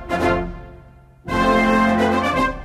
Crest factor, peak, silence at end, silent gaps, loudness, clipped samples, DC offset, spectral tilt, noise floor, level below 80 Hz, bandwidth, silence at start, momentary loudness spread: 14 dB; -4 dBFS; 0 s; none; -18 LUFS; under 0.1%; under 0.1%; -6 dB/octave; -45 dBFS; -34 dBFS; 14.5 kHz; 0 s; 17 LU